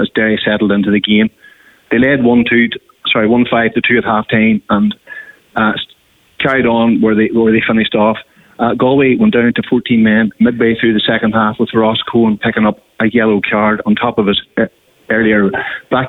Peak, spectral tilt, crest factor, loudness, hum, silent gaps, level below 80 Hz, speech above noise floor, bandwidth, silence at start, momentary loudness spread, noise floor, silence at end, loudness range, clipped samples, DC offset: -2 dBFS; -8 dB/octave; 10 dB; -12 LUFS; none; none; -46 dBFS; 37 dB; 4.1 kHz; 0 s; 7 LU; -49 dBFS; 0 s; 2 LU; under 0.1%; under 0.1%